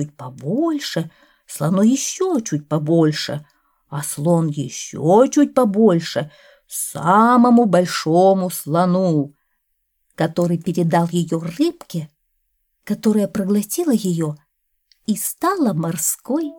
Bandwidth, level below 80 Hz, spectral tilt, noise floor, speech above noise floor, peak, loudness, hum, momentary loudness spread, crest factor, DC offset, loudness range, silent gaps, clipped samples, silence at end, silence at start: 19 kHz; -64 dBFS; -5.5 dB/octave; -70 dBFS; 52 dB; -2 dBFS; -18 LUFS; none; 15 LU; 16 dB; under 0.1%; 6 LU; none; under 0.1%; 0 s; 0 s